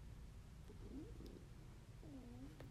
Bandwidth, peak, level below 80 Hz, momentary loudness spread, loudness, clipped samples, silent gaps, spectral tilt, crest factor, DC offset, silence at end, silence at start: 15 kHz; -42 dBFS; -60 dBFS; 5 LU; -58 LUFS; under 0.1%; none; -6.5 dB/octave; 14 dB; under 0.1%; 0 s; 0 s